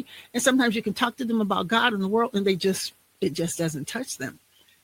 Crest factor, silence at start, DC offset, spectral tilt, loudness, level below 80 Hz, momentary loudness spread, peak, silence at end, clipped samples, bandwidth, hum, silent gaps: 20 dB; 0 s; under 0.1%; -4 dB/octave; -25 LUFS; -64 dBFS; 10 LU; -6 dBFS; 0.5 s; under 0.1%; 17 kHz; none; none